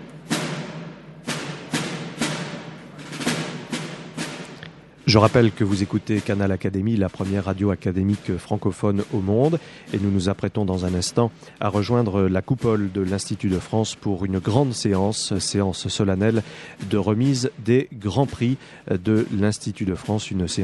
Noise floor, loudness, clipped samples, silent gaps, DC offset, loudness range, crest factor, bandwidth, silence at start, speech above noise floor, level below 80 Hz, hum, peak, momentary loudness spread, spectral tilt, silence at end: -42 dBFS; -23 LUFS; under 0.1%; none; under 0.1%; 7 LU; 22 dB; 12 kHz; 0 s; 21 dB; -50 dBFS; none; 0 dBFS; 11 LU; -6 dB/octave; 0 s